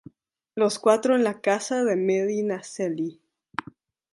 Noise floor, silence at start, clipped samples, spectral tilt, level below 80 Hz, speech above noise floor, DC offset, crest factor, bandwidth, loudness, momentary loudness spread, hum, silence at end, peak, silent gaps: -55 dBFS; 0.55 s; under 0.1%; -5 dB/octave; -74 dBFS; 32 dB; under 0.1%; 20 dB; 11.5 kHz; -24 LUFS; 15 LU; none; 1 s; -4 dBFS; none